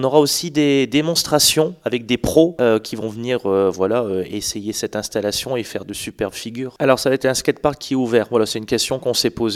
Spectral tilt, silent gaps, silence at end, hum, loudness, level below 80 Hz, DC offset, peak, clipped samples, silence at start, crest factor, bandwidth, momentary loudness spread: -4 dB/octave; none; 0 s; none; -19 LUFS; -48 dBFS; under 0.1%; 0 dBFS; under 0.1%; 0 s; 18 dB; 17 kHz; 10 LU